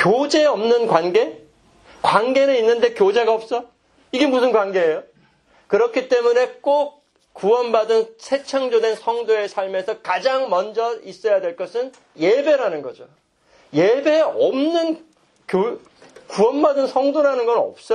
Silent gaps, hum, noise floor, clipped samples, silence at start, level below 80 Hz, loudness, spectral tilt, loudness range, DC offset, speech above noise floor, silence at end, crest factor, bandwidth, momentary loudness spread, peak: none; none; -56 dBFS; under 0.1%; 0 s; -68 dBFS; -19 LUFS; -5 dB/octave; 3 LU; under 0.1%; 38 dB; 0 s; 18 dB; 10.5 kHz; 9 LU; 0 dBFS